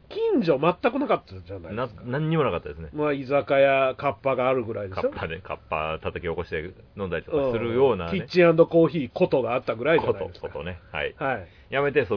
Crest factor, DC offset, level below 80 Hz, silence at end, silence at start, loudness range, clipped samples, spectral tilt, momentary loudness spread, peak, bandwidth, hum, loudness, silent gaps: 20 dB; under 0.1%; -50 dBFS; 0 s; 0.1 s; 6 LU; under 0.1%; -8.5 dB/octave; 13 LU; -6 dBFS; 5.4 kHz; none; -24 LUFS; none